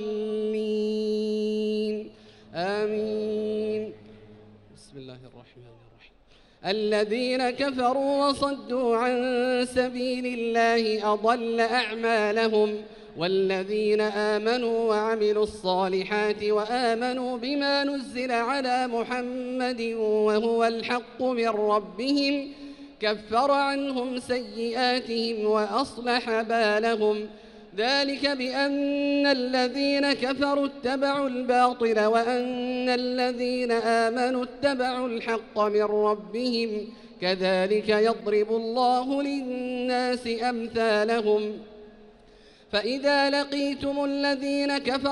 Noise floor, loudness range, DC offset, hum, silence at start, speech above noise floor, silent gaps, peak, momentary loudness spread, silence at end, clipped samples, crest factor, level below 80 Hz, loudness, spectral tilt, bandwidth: -57 dBFS; 4 LU; under 0.1%; none; 0 s; 32 dB; none; -10 dBFS; 7 LU; 0 s; under 0.1%; 16 dB; -60 dBFS; -26 LUFS; -4.5 dB/octave; 11.5 kHz